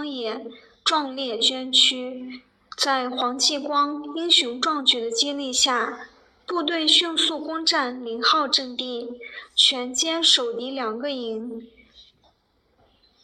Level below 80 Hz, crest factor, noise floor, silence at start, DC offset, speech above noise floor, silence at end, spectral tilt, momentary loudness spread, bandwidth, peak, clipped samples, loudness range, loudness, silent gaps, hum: -68 dBFS; 20 dB; -66 dBFS; 0 s; under 0.1%; 42 dB; 1.2 s; 0 dB/octave; 16 LU; 15.5 kHz; -4 dBFS; under 0.1%; 2 LU; -21 LUFS; none; none